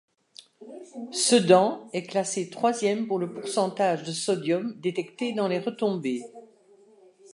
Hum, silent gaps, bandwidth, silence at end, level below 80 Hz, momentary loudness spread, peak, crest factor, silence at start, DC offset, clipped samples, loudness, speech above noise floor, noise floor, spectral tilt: none; none; 11.5 kHz; 0.9 s; -80 dBFS; 14 LU; -4 dBFS; 22 dB; 0.6 s; under 0.1%; under 0.1%; -26 LUFS; 31 dB; -57 dBFS; -4 dB/octave